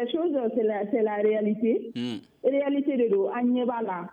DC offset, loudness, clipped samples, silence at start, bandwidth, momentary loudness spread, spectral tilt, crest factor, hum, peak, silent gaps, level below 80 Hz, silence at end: under 0.1%; -26 LUFS; under 0.1%; 0 s; 8.4 kHz; 5 LU; -8 dB/octave; 14 dB; none; -12 dBFS; none; -76 dBFS; 0 s